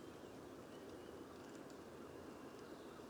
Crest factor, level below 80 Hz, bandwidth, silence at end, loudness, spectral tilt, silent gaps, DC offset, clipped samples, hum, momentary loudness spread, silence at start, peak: 14 dB; -78 dBFS; over 20 kHz; 0 s; -55 LUFS; -5 dB/octave; none; under 0.1%; under 0.1%; none; 1 LU; 0 s; -42 dBFS